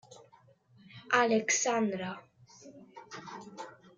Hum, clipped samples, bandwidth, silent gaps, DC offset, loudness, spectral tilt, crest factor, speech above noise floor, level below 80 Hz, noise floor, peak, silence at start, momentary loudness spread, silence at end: none; under 0.1%; 10 kHz; none; under 0.1%; -29 LUFS; -2.5 dB/octave; 24 dB; 34 dB; -80 dBFS; -63 dBFS; -12 dBFS; 0.1 s; 26 LU; 0.25 s